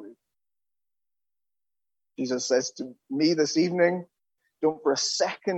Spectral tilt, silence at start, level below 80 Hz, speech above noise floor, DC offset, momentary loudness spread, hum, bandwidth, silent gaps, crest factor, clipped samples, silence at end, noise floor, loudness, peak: -3.5 dB/octave; 0 s; -80 dBFS; over 65 dB; under 0.1%; 12 LU; none; 8.4 kHz; none; 20 dB; under 0.1%; 0 s; under -90 dBFS; -26 LUFS; -8 dBFS